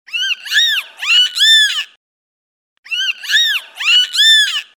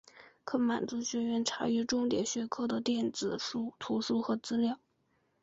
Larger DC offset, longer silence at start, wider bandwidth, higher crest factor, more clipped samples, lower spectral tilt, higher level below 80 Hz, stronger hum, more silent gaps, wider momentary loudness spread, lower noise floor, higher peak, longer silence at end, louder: neither; about the same, 0.1 s vs 0.15 s; first, over 20 kHz vs 8 kHz; about the same, 14 dB vs 16 dB; neither; second, 7.5 dB/octave vs -4 dB/octave; second, under -90 dBFS vs -70 dBFS; neither; first, 1.96-2.83 s vs none; first, 10 LU vs 5 LU; first, under -90 dBFS vs -75 dBFS; first, -2 dBFS vs -18 dBFS; second, 0.15 s vs 0.65 s; first, -11 LUFS vs -33 LUFS